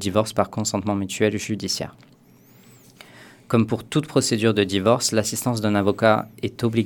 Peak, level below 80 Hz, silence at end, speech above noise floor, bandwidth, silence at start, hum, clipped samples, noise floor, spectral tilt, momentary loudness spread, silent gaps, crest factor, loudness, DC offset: -2 dBFS; -58 dBFS; 0 s; 30 dB; 19 kHz; 0 s; none; under 0.1%; -52 dBFS; -4.5 dB/octave; 7 LU; none; 20 dB; -22 LUFS; under 0.1%